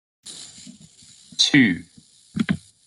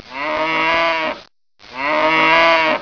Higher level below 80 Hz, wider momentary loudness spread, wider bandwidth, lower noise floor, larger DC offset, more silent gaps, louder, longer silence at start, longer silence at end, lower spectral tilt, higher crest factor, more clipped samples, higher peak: second, -60 dBFS vs -50 dBFS; first, 24 LU vs 13 LU; first, 11.5 kHz vs 5.4 kHz; about the same, -49 dBFS vs -46 dBFS; neither; neither; second, -20 LUFS vs -15 LUFS; first, 0.25 s vs 0.05 s; first, 0.3 s vs 0 s; about the same, -3.5 dB/octave vs -3.5 dB/octave; about the same, 20 dB vs 16 dB; neither; second, -6 dBFS vs -2 dBFS